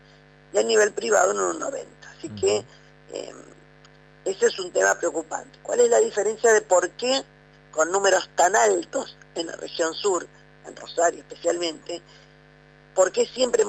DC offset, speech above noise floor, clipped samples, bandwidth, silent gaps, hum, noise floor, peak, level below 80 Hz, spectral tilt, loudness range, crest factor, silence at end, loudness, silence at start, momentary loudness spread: under 0.1%; 29 dB; under 0.1%; 15 kHz; none; 50 Hz at -55 dBFS; -52 dBFS; -8 dBFS; -62 dBFS; -1.5 dB/octave; 6 LU; 16 dB; 0 s; -23 LUFS; 0.55 s; 17 LU